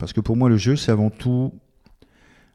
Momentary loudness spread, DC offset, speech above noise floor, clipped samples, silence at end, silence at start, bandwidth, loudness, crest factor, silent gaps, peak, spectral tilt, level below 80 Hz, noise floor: 6 LU; under 0.1%; 35 dB; under 0.1%; 0.95 s; 0 s; 11 kHz; -20 LUFS; 16 dB; none; -4 dBFS; -7 dB/octave; -44 dBFS; -55 dBFS